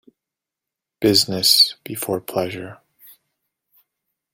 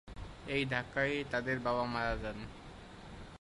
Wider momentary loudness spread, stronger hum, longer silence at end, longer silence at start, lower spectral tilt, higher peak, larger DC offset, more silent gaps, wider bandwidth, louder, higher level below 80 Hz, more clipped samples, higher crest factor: about the same, 16 LU vs 17 LU; neither; first, 1.6 s vs 0.05 s; first, 1 s vs 0.05 s; second, -3 dB/octave vs -6 dB/octave; first, -2 dBFS vs -18 dBFS; neither; neither; first, 17 kHz vs 11.5 kHz; first, -17 LUFS vs -35 LUFS; second, -60 dBFS vs -52 dBFS; neither; about the same, 22 dB vs 20 dB